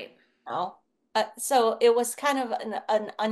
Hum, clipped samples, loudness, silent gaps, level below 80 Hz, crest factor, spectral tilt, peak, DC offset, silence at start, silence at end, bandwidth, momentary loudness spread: none; under 0.1%; -26 LUFS; none; -82 dBFS; 18 dB; -2.5 dB/octave; -10 dBFS; under 0.1%; 0 s; 0 s; 12.5 kHz; 11 LU